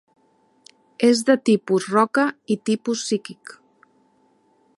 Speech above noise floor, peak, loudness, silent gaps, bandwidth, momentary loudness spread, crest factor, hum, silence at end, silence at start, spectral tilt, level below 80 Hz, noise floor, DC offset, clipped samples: 42 dB; -4 dBFS; -20 LUFS; none; 11.5 kHz; 13 LU; 20 dB; none; 1.45 s; 1 s; -4.5 dB/octave; -74 dBFS; -62 dBFS; under 0.1%; under 0.1%